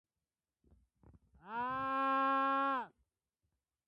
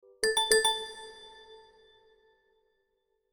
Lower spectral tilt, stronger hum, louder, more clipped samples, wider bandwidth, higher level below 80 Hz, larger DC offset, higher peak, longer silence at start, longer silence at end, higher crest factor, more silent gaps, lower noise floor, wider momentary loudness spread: first, -6 dB/octave vs 1 dB/octave; neither; second, -35 LUFS vs -26 LUFS; neither; second, 5.8 kHz vs 19.5 kHz; second, -74 dBFS vs -64 dBFS; neither; second, -26 dBFS vs -8 dBFS; first, 1.45 s vs 0.2 s; second, 1 s vs 1.75 s; second, 12 dB vs 26 dB; neither; first, under -90 dBFS vs -78 dBFS; second, 11 LU vs 25 LU